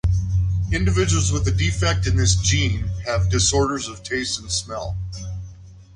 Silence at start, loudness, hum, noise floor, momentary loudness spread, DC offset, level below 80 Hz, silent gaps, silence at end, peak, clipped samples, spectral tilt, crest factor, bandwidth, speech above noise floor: 0.05 s; -21 LUFS; none; -41 dBFS; 12 LU; under 0.1%; -28 dBFS; none; 0.15 s; -4 dBFS; under 0.1%; -4 dB/octave; 16 dB; 11 kHz; 21 dB